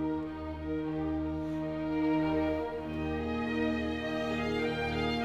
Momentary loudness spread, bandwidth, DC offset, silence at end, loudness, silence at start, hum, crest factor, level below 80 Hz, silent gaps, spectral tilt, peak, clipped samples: 6 LU; 8.8 kHz; under 0.1%; 0 s; -33 LUFS; 0 s; none; 14 dB; -48 dBFS; none; -7 dB/octave; -20 dBFS; under 0.1%